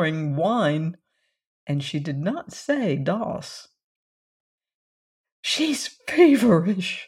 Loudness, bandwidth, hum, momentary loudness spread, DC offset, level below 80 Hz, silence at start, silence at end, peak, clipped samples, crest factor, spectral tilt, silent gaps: -23 LUFS; 15.5 kHz; none; 15 LU; under 0.1%; -64 dBFS; 0 s; 0 s; -4 dBFS; under 0.1%; 20 dB; -5.5 dB/octave; 1.46-1.67 s, 3.84-4.58 s, 4.74-5.24 s, 5.32-5.43 s